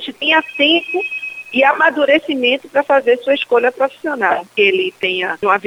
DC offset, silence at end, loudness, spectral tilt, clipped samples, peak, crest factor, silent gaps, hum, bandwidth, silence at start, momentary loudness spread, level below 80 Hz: under 0.1%; 0 s; -15 LUFS; -4 dB/octave; under 0.1%; 0 dBFS; 16 dB; none; none; 15.5 kHz; 0 s; 7 LU; -66 dBFS